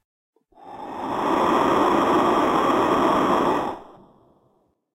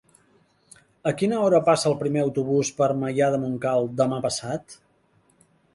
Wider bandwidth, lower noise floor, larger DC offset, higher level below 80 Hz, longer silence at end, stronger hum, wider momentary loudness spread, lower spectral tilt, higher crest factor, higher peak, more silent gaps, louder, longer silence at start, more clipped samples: first, 16 kHz vs 11.5 kHz; about the same, -65 dBFS vs -63 dBFS; neither; first, -52 dBFS vs -64 dBFS; about the same, 1.1 s vs 1 s; neither; first, 13 LU vs 9 LU; about the same, -5.5 dB/octave vs -5.5 dB/octave; about the same, 16 dB vs 18 dB; about the same, -8 dBFS vs -6 dBFS; neither; first, -20 LUFS vs -23 LUFS; second, 0.65 s vs 1.05 s; neither